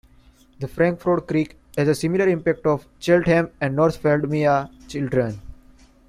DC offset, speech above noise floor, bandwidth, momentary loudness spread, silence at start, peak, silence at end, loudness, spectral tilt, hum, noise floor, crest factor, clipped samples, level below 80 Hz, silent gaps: under 0.1%; 32 dB; 15 kHz; 10 LU; 0.6 s; -4 dBFS; 0.55 s; -21 LUFS; -7 dB/octave; none; -53 dBFS; 18 dB; under 0.1%; -48 dBFS; none